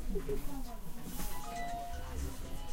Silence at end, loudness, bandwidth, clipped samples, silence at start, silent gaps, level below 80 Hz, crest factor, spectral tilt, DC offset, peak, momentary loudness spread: 0 s; -43 LUFS; 16 kHz; under 0.1%; 0 s; none; -40 dBFS; 14 dB; -5 dB/octave; under 0.1%; -22 dBFS; 6 LU